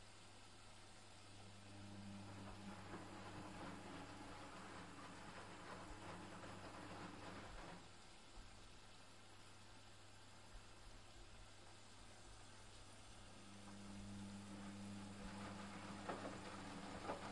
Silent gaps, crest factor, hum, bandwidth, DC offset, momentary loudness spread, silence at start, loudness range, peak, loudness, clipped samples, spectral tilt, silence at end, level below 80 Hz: none; 22 dB; none; 11.5 kHz; under 0.1%; 10 LU; 0 s; 9 LU; -34 dBFS; -57 LUFS; under 0.1%; -4.5 dB/octave; 0 s; -68 dBFS